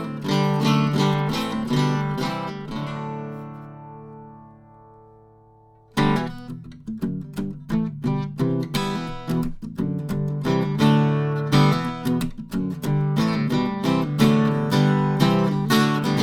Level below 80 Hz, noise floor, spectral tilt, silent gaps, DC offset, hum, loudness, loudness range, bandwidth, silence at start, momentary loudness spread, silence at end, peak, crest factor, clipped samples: -46 dBFS; -52 dBFS; -6.5 dB/octave; none; under 0.1%; none; -22 LUFS; 9 LU; 16.5 kHz; 0 s; 14 LU; 0 s; -4 dBFS; 18 dB; under 0.1%